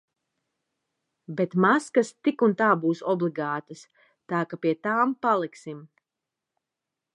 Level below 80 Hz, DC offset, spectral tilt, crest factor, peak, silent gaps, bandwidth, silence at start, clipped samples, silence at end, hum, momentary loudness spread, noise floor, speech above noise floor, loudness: -80 dBFS; under 0.1%; -6.5 dB/octave; 20 dB; -6 dBFS; none; 11 kHz; 1.3 s; under 0.1%; 1.3 s; none; 13 LU; -87 dBFS; 62 dB; -25 LUFS